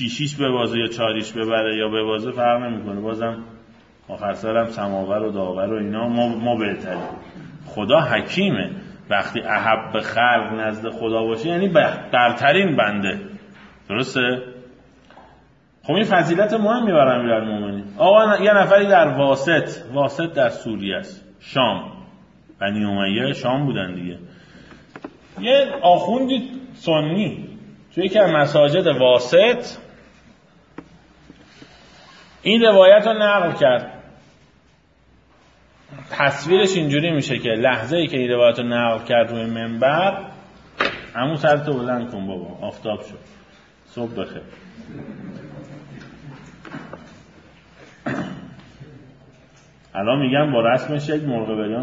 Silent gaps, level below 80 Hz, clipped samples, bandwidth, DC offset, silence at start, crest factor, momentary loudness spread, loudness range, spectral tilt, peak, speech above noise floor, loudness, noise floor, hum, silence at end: none; -58 dBFS; under 0.1%; 7.8 kHz; under 0.1%; 0 s; 20 dB; 21 LU; 15 LU; -6 dB/octave; 0 dBFS; 37 dB; -19 LUFS; -56 dBFS; none; 0 s